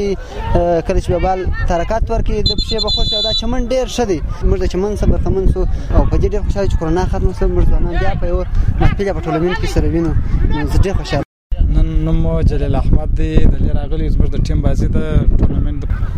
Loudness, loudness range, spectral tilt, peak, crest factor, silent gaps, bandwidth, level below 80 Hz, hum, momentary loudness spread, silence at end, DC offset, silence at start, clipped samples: -17 LUFS; 1 LU; -6.5 dB/octave; 0 dBFS; 14 dB; 11.25-11.50 s; 9.2 kHz; -16 dBFS; none; 4 LU; 0 s; under 0.1%; 0 s; under 0.1%